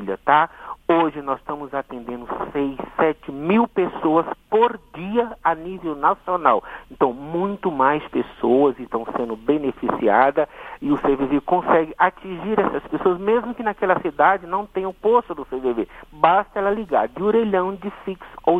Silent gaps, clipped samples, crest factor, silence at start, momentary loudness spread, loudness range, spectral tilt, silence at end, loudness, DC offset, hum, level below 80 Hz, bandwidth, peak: none; under 0.1%; 20 dB; 0 s; 10 LU; 2 LU; -8 dB/octave; 0 s; -21 LUFS; under 0.1%; none; -50 dBFS; 4.7 kHz; 0 dBFS